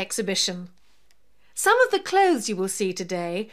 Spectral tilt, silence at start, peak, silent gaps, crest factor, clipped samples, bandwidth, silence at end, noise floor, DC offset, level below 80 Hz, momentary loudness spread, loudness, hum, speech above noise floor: -3 dB/octave; 0 s; -6 dBFS; none; 18 dB; under 0.1%; 15.5 kHz; 0.05 s; -66 dBFS; 0.3%; -70 dBFS; 9 LU; -23 LUFS; none; 42 dB